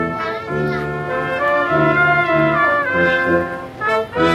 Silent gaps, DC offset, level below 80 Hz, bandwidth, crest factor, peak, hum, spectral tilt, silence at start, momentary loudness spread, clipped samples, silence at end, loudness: none; under 0.1%; -44 dBFS; 13.5 kHz; 14 dB; -2 dBFS; none; -7 dB/octave; 0 s; 8 LU; under 0.1%; 0 s; -17 LUFS